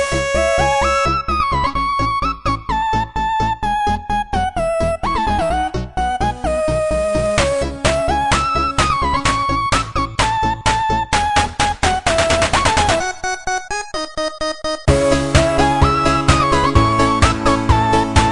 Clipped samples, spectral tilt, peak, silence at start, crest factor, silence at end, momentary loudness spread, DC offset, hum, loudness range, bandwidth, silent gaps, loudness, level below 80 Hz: under 0.1%; -4.5 dB/octave; 0 dBFS; 0 s; 16 dB; 0 s; 7 LU; under 0.1%; none; 4 LU; 11 kHz; none; -17 LUFS; -26 dBFS